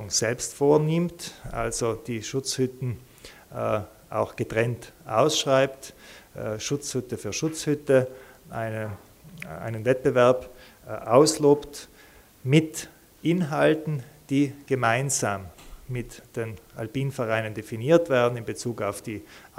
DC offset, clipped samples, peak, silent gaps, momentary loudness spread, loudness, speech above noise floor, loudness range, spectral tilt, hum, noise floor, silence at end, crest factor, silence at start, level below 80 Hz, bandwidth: under 0.1%; under 0.1%; -4 dBFS; none; 16 LU; -25 LUFS; 27 dB; 5 LU; -5 dB/octave; none; -52 dBFS; 0.2 s; 22 dB; 0 s; -54 dBFS; 16 kHz